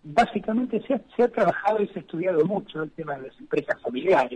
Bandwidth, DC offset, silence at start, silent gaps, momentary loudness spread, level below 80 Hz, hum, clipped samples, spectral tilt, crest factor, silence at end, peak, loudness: 10 kHz; under 0.1%; 0.05 s; none; 11 LU; -60 dBFS; none; under 0.1%; -7 dB/octave; 16 dB; 0 s; -10 dBFS; -25 LUFS